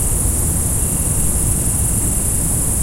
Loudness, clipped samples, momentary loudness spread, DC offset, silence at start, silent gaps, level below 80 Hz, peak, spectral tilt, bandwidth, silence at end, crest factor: -16 LUFS; under 0.1%; 1 LU; under 0.1%; 0 s; none; -22 dBFS; -4 dBFS; -4 dB/octave; 16 kHz; 0 s; 14 dB